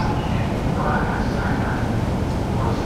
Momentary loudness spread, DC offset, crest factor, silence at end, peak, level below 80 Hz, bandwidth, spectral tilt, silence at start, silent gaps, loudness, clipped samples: 2 LU; under 0.1%; 12 dB; 0 s; -8 dBFS; -30 dBFS; 15 kHz; -7 dB/octave; 0 s; none; -22 LUFS; under 0.1%